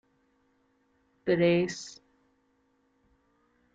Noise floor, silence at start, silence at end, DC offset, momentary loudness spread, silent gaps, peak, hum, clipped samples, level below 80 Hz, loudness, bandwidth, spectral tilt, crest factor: -71 dBFS; 1.25 s; 1.8 s; under 0.1%; 17 LU; none; -14 dBFS; none; under 0.1%; -68 dBFS; -27 LUFS; 7.8 kHz; -6 dB/octave; 20 dB